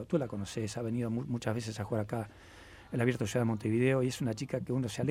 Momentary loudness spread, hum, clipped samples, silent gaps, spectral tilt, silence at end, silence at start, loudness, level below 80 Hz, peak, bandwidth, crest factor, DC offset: 10 LU; none; under 0.1%; none; -6.5 dB/octave; 0 s; 0 s; -34 LUFS; -62 dBFS; -14 dBFS; 15.5 kHz; 18 dB; under 0.1%